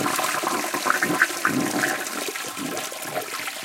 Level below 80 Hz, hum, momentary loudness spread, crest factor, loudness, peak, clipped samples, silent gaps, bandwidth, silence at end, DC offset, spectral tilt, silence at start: -70 dBFS; none; 8 LU; 22 dB; -24 LUFS; -4 dBFS; under 0.1%; none; 17 kHz; 0 s; under 0.1%; -2 dB/octave; 0 s